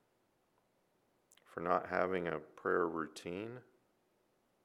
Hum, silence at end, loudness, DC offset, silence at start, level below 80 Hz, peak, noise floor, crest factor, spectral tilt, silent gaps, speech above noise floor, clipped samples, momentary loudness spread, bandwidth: none; 1.05 s; -38 LUFS; under 0.1%; 1.5 s; -78 dBFS; -16 dBFS; -77 dBFS; 24 dB; -6 dB/octave; none; 40 dB; under 0.1%; 13 LU; 13.5 kHz